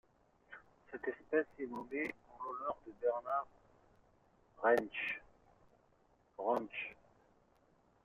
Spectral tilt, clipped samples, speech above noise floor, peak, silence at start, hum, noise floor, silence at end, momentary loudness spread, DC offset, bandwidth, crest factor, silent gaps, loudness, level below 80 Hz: -2.5 dB/octave; under 0.1%; 34 dB; -20 dBFS; 0.5 s; none; -72 dBFS; 1.1 s; 20 LU; under 0.1%; 8 kHz; 22 dB; none; -39 LUFS; -76 dBFS